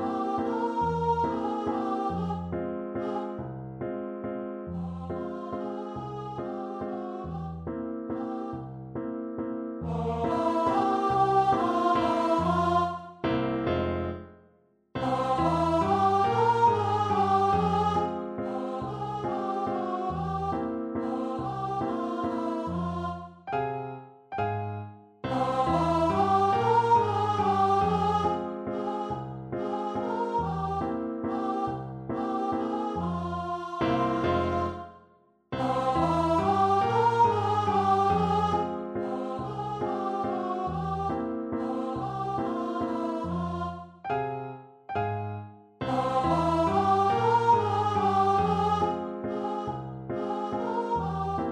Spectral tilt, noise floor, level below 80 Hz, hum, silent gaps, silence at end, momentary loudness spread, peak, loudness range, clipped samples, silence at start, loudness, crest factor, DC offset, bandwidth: -7.5 dB/octave; -64 dBFS; -52 dBFS; none; none; 0 s; 12 LU; -12 dBFS; 10 LU; under 0.1%; 0 s; -28 LUFS; 16 dB; under 0.1%; 11 kHz